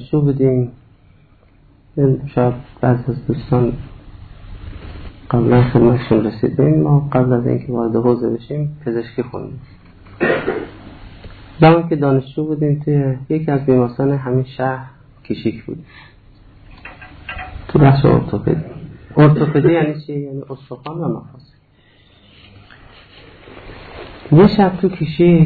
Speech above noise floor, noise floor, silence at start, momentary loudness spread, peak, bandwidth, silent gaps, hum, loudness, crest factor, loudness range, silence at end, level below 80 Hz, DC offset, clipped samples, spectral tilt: 36 dB; -51 dBFS; 0 s; 22 LU; 0 dBFS; 4.7 kHz; none; none; -16 LUFS; 16 dB; 9 LU; 0 s; -40 dBFS; under 0.1%; under 0.1%; -11.5 dB/octave